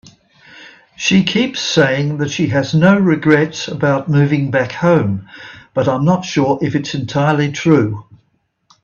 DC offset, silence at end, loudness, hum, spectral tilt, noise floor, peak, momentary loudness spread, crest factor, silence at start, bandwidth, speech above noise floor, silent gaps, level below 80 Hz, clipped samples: under 0.1%; 0.8 s; -15 LUFS; none; -6 dB/octave; -63 dBFS; 0 dBFS; 8 LU; 16 dB; 0.55 s; 7.2 kHz; 49 dB; none; -52 dBFS; under 0.1%